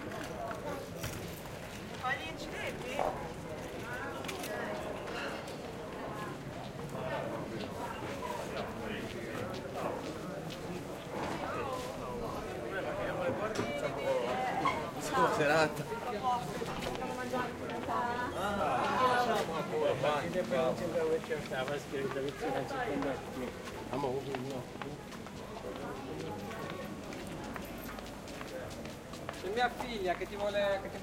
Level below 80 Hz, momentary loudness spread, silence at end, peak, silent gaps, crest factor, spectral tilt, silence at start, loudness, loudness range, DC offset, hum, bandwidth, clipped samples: -58 dBFS; 11 LU; 0 s; -14 dBFS; none; 22 dB; -5 dB/octave; 0 s; -37 LUFS; 8 LU; under 0.1%; none; 16.5 kHz; under 0.1%